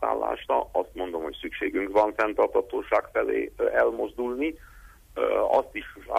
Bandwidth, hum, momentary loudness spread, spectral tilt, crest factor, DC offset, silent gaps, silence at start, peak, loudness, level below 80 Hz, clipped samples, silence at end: 15.5 kHz; none; 9 LU; -5.5 dB/octave; 16 dB; under 0.1%; none; 0 s; -10 dBFS; -26 LUFS; -52 dBFS; under 0.1%; 0 s